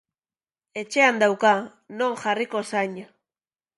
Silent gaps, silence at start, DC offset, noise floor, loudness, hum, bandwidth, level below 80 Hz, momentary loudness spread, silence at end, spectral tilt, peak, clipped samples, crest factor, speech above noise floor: none; 0.75 s; under 0.1%; under -90 dBFS; -22 LUFS; none; 11.5 kHz; -76 dBFS; 18 LU; 0.75 s; -3.5 dB/octave; -4 dBFS; under 0.1%; 22 dB; over 67 dB